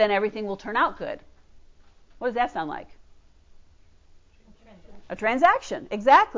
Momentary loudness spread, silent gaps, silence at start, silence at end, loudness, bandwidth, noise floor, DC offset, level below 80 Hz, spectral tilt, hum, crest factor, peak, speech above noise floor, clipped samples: 16 LU; none; 0 s; 0 s; -24 LUFS; 7.6 kHz; -54 dBFS; under 0.1%; -56 dBFS; -4.5 dB/octave; none; 20 dB; -6 dBFS; 31 dB; under 0.1%